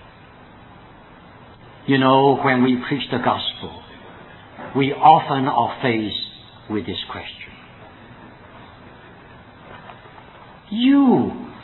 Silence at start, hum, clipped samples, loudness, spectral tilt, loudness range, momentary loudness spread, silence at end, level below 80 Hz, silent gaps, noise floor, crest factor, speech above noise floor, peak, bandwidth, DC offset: 1.85 s; none; under 0.1%; -18 LUFS; -9.5 dB/octave; 14 LU; 27 LU; 0 s; -56 dBFS; none; -45 dBFS; 22 dB; 27 dB; 0 dBFS; 4.2 kHz; under 0.1%